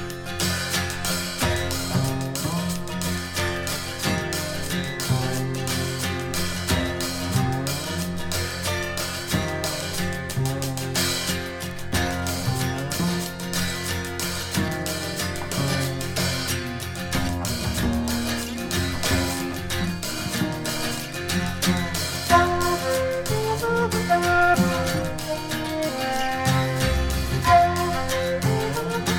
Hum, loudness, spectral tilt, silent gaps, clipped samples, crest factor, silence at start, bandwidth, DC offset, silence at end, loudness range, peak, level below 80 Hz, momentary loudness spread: none; -24 LUFS; -4 dB/octave; none; under 0.1%; 20 dB; 0 s; 19 kHz; under 0.1%; 0 s; 4 LU; -4 dBFS; -38 dBFS; 6 LU